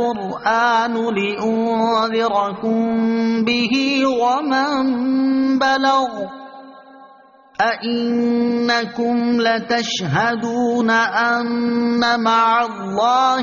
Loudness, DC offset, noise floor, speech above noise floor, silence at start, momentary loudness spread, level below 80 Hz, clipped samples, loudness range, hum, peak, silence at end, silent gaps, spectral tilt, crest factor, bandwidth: -18 LUFS; under 0.1%; -47 dBFS; 30 dB; 0 s; 5 LU; -58 dBFS; under 0.1%; 3 LU; none; -4 dBFS; 0 s; none; -2.5 dB/octave; 14 dB; 7.2 kHz